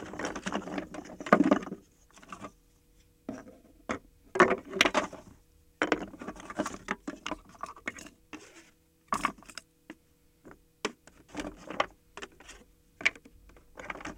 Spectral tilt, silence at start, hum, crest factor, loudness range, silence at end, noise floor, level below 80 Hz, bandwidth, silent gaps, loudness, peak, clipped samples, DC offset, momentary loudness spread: -4 dB/octave; 0 s; none; 28 dB; 10 LU; 0 s; -65 dBFS; -60 dBFS; 16.5 kHz; none; -32 LUFS; -6 dBFS; under 0.1%; under 0.1%; 23 LU